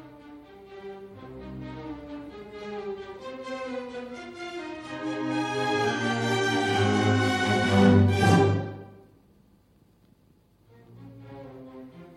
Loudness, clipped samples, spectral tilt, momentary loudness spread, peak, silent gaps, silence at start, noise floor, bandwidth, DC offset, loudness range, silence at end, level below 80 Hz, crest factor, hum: -25 LUFS; under 0.1%; -6 dB/octave; 24 LU; -8 dBFS; none; 0 s; -61 dBFS; 12.5 kHz; under 0.1%; 16 LU; 0 s; -58 dBFS; 20 dB; none